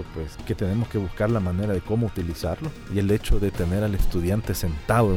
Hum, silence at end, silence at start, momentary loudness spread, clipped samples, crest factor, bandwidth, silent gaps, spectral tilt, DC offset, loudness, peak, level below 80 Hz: none; 0 s; 0 s; 6 LU; under 0.1%; 14 dB; 17 kHz; none; -7 dB/octave; under 0.1%; -26 LUFS; -8 dBFS; -32 dBFS